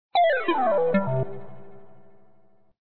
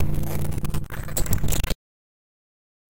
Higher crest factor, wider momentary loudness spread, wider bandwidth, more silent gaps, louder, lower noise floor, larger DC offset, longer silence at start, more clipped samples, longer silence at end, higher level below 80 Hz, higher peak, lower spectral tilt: about the same, 14 dB vs 16 dB; first, 11 LU vs 7 LU; second, 4.4 kHz vs 17 kHz; neither; first, -23 LUFS vs -28 LUFS; second, -60 dBFS vs under -90 dBFS; second, under 0.1% vs 6%; about the same, 0.1 s vs 0 s; neither; second, 0.05 s vs 1.15 s; second, -60 dBFS vs -30 dBFS; about the same, -12 dBFS vs -10 dBFS; first, -10 dB/octave vs -4.5 dB/octave